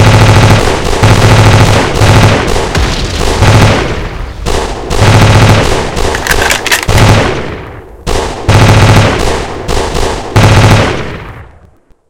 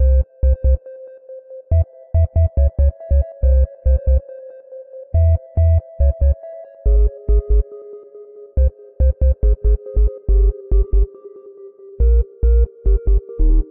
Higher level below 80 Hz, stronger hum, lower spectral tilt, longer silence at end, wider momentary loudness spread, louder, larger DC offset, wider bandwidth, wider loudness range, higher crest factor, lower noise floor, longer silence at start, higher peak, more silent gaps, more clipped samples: about the same, -16 dBFS vs -16 dBFS; neither; second, -5 dB/octave vs -14 dB/octave; about the same, 0 s vs 0.05 s; second, 13 LU vs 20 LU; first, -7 LUFS vs -18 LUFS; first, 3% vs under 0.1%; first, 17 kHz vs 1.7 kHz; about the same, 2 LU vs 2 LU; about the same, 8 dB vs 10 dB; about the same, -42 dBFS vs -39 dBFS; about the same, 0 s vs 0 s; first, 0 dBFS vs -6 dBFS; neither; first, 5% vs under 0.1%